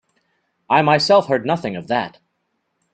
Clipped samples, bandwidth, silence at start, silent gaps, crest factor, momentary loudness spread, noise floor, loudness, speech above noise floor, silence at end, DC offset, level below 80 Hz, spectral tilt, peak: under 0.1%; 9.2 kHz; 0.7 s; none; 20 dB; 9 LU; -71 dBFS; -17 LUFS; 54 dB; 0.85 s; under 0.1%; -62 dBFS; -5.5 dB/octave; 0 dBFS